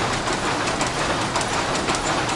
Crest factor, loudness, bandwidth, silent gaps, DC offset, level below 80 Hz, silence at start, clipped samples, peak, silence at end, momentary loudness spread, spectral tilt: 16 dB; -22 LUFS; 11.5 kHz; none; under 0.1%; -40 dBFS; 0 s; under 0.1%; -6 dBFS; 0 s; 1 LU; -3 dB/octave